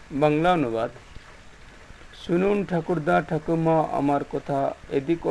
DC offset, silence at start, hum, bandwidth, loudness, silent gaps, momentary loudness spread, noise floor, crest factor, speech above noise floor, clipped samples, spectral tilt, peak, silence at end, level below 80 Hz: under 0.1%; 0 s; none; 11 kHz; -24 LUFS; none; 7 LU; -46 dBFS; 18 dB; 23 dB; under 0.1%; -7.5 dB/octave; -6 dBFS; 0 s; -48 dBFS